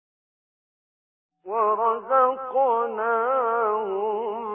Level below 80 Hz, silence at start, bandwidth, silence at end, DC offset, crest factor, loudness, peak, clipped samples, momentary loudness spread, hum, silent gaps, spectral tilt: -74 dBFS; 1.45 s; 3.5 kHz; 0 s; under 0.1%; 16 dB; -23 LUFS; -8 dBFS; under 0.1%; 6 LU; none; none; -8.5 dB/octave